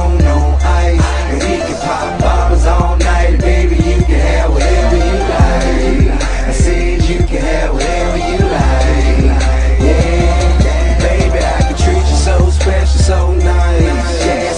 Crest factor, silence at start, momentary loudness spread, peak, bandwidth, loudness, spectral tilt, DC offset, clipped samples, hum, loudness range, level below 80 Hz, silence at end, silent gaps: 10 dB; 0 s; 4 LU; 0 dBFS; 10.5 kHz; -12 LUFS; -6 dB/octave; 0.4%; under 0.1%; none; 2 LU; -12 dBFS; 0 s; none